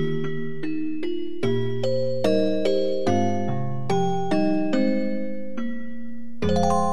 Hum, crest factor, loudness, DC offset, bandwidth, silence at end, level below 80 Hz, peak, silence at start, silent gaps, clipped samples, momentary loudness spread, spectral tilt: none; 18 dB; -25 LUFS; 5%; 12 kHz; 0 s; -52 dBFS; -6 dBFS; 0 s; none; under 0.1%; 10 LU; -7 dB/octave